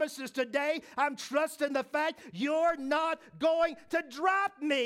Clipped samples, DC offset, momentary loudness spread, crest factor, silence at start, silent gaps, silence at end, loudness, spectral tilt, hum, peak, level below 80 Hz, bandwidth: under 0.1%; under 0.1%; 6 LU; 16 dB; 0 s; none; 0 s; -31 LUFS; -3.5 dB/octave; none; -16 dBFS; -72 dBFS; 16 kHz